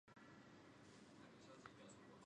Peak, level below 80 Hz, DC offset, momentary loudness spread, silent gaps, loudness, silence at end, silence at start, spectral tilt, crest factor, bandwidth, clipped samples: -40 dBFS; -86 dBFS; under 0.1%; 3 LU; none; -64 LUFS; 0 s; 0.05 s; -4.5 dB/octave; 24 dB; 10 kHz; under 0.1%